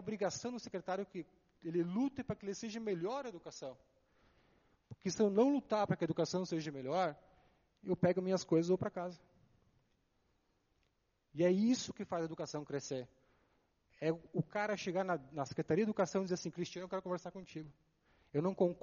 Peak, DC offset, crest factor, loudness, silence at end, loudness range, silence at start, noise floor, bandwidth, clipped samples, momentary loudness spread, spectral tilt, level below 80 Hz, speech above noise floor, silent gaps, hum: -18 dBFS; under 0.1%; 20 dB; -38 LUFS; 0.05 s; 5 LU; 0 s; -80 dBFS; 7.2 kHz; under 0.1%; 15 LU; -6 dB/octave; -74 dBFS; 42 dB; none; none